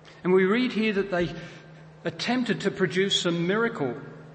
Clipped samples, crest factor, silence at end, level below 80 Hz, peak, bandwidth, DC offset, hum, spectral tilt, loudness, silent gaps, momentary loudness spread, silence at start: under 0.1%; 16 dB; 0 s; -60 dBFS; -10 dBFS; 8.8 kHz; under 0.1%; none; -5 dB/octave; -25 LUFS; none; 13 LU; 0.05 s